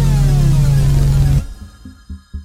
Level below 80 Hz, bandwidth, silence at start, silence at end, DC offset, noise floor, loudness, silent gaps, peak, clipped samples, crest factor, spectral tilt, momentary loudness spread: -18 dBFS; 14.5 kHz; 0 s; 0 s; under 0.1%; -36 dBFS; -14 LUFS; none; -2 dBFS; under 0.1%; 10 dB; -7 dB/octave; 19 LU